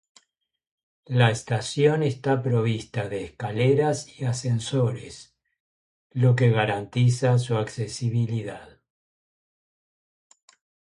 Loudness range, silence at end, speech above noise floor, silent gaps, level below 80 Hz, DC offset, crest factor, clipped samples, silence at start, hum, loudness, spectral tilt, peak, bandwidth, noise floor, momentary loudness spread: 3 LU; 2.2 s; 49 dB; 5.60-6.10 s; -58 dBFS; under 0.1%; 18 dB; under 0.1%; 1.1 s; none; -24 LUFS; -6.5 dB/octave; -6 dBFS; 11 kHz; -72 dBFS; 11 LU